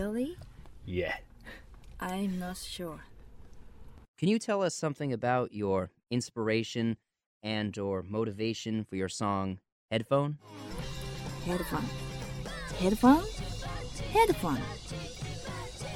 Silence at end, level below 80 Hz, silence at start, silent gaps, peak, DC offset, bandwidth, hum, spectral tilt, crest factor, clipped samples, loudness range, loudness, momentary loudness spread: 0 s; -48 dBFS; 0 s; 4.08-4.14 s, 7.26-7.41 s, 9.72-9.89 s; -10 dBFS; under 0.1%; 16 kHz; none; -5.5 dB/octave; 22 dB; under 0.1%; 8 LU; -33 LUFS; 14 LU